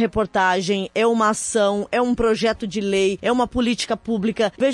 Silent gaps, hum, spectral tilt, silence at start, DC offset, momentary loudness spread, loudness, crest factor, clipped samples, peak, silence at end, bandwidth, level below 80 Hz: none; none; -4 dB/octave; 0 s; under 0.1%; 4 LU; -20 LUFS; 14 dB; under 0.1%; -6 dBFS; 0 s; 11.5 kHz; -46 dBFS